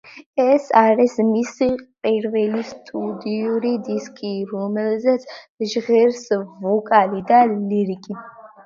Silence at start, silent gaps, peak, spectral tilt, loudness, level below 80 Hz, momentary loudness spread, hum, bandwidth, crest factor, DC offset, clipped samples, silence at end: 0.05 s; 0.26-0.33 s, 5.49-5.58 s; 0 dBFS; -6 dB/octave; -19 LUFS; -62 dBFS; 12 LU; none; 7.6 kHz; 18 dB; under 0.1%; under 0.1%; 0.2 s